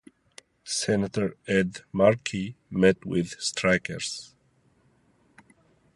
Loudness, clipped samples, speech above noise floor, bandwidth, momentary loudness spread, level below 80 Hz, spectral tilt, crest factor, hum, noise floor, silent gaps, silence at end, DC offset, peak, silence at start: -26 LUFS; under 0.1%; 39 dB; 11.5 kHz; 11 LU; -56 dBFS; -4.5 dB/octave; 22 dB; none; -65 dBFS; none; 1.7 s; under 0.1%; -6 dBFS; 0.65 s